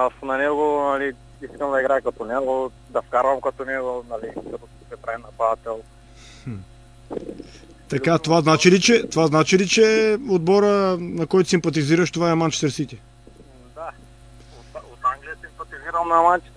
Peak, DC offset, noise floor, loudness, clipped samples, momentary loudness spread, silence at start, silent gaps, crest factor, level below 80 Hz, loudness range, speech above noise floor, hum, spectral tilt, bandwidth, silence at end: -2 dBFS; under 0.1%; -46 dBFS; -20 LUFS; under 0.1%; 21 LU; 0 s; none; 20 dB; -50 dBFS; 13 LU; 26 dB; none; -5 dB/octave; 11 kHz; 0.15 s